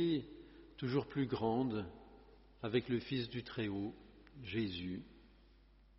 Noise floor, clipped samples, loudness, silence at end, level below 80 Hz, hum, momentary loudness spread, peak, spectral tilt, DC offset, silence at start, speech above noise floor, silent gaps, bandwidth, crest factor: -65 dBFS; under 0.1%; -40 LUFS; 0.7 s; -64 dBFS; none; 21 LU; -22 dBFS; -5.5 dB/octave; under 0.1%; 0 s; 26 dB; none; 5.8 kHz; 20 dB